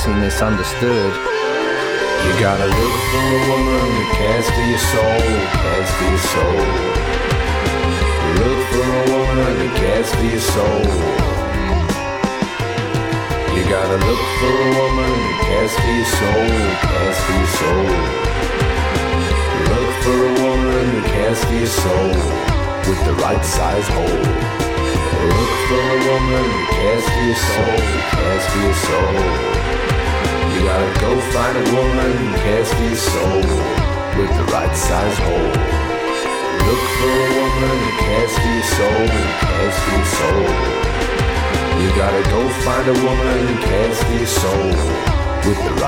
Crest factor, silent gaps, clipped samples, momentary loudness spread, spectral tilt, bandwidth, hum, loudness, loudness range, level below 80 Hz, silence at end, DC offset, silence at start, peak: 14 dB; none; under 0.1%; 3 LU; -5 dB/octave; 18.5 kHz; none; -16 LUFS; 1 LU; -24 dBFS; 0 s; under 0.1%; 0 s; -2 dBFS